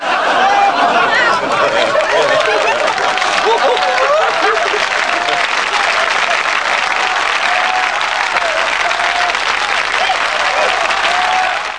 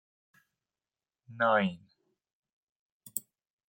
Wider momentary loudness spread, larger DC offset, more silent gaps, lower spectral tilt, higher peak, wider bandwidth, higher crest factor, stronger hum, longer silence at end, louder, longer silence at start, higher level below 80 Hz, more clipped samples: second, 2 LU vs 13 LU; first, 0.4% vs under 0.1%; second, none vs 2.33-2.43 s, 2.53-3.00 s; second, -1 dB/octave vs -4.5 dB/octave; first, 0 dBFS vs -12 dBFS; second, 10.5 kHz vs 16.5 kHz; second, 14 dB vs 24 dB; neither; second, 0 s vs 0.5 s; first, -12 LUFS vs -31 LUFS; second, 0 s vs 1.3 s; first, -50 dBFS vs -84 dBFS; neither